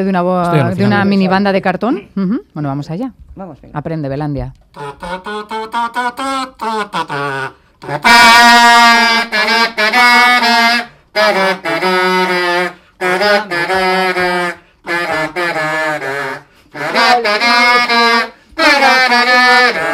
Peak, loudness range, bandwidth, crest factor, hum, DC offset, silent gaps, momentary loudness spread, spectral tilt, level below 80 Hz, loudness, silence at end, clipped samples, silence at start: 0 dBFS; 13 LU; 17 kHz; 12 dB; none; under 0.1%; none; 17 LU; -3.5 dB/octave; -44 dBFS; -11 LUFS; 0 s; under 0.1%; 0 s